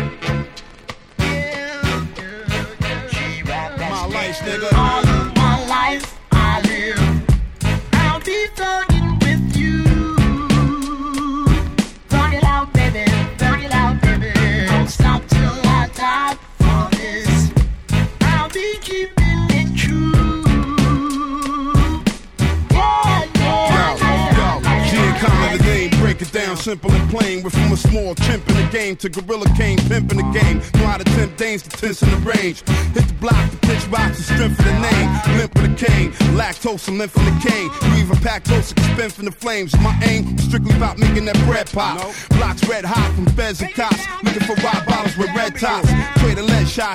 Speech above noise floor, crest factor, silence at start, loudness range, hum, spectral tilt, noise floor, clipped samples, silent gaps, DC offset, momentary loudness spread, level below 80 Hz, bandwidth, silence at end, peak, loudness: 20 dB; 16 dB; 0 s; 2 LU; none; -6 dB/octave; -36 dBFS; under 0.1%; none; under 0.1%; 7 LU; -24 dBFS; 15.5 kHz; 0 s; 0 dBFS; -17 LUFS